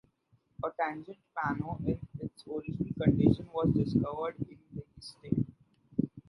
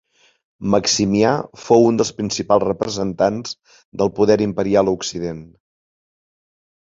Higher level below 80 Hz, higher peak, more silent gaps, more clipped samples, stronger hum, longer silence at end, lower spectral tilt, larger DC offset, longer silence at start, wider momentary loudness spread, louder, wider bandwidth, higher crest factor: about the same, -52 dBFS vs -50 dBFS; second, -10 dBFS vs -2 dBFS; second, none vs 3.85-3.92 s; neither; neither; second, 0.1 s vs 1.35 s; first, -9 dB/octave vs -5 dB/octave; neither; about the same, 0.6 s vs 0.6 s; first, 16 LU vs 13 LU; second, -33 LUFS vs -18 LUFS; first, 11.5 kHz vs 7.8 kHz; about the same, 22 dB vs 18 dB